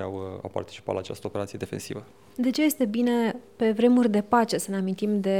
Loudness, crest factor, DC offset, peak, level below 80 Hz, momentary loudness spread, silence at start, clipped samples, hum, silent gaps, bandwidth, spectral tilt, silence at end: -26 LUFS; 18 dB; 0.1%; -8 dBFS; -64 dBFS; 14 LU; 0 s; under 0.1%; none; none; 16.5 kHz; -5.5 dB/octave; 0 s